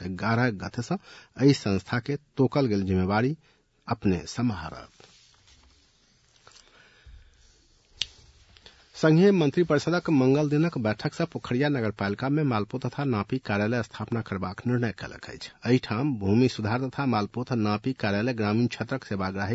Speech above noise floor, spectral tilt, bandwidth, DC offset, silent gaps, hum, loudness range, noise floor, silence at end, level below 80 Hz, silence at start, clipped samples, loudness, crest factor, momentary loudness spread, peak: 37 dB; -7 dB/octave; 8 kHz; under 0.1%; none; none; 10 LU; -63 dBFS; 0 s; -60 dBFS; 0 s; under 0.1%; -26 LUFS; 22 dB; 11 LU; -4 dBFS